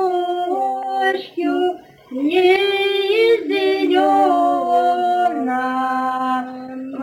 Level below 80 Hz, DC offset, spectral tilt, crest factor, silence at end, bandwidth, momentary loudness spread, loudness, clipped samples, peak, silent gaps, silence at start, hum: -68 dBFS; under 0.1%; -4 dB/octave; 14 dB; 0 s; 17 kHz; 8 LU; -18 LUFS; under 0.1%; -4 dBFS; none; 0 s; none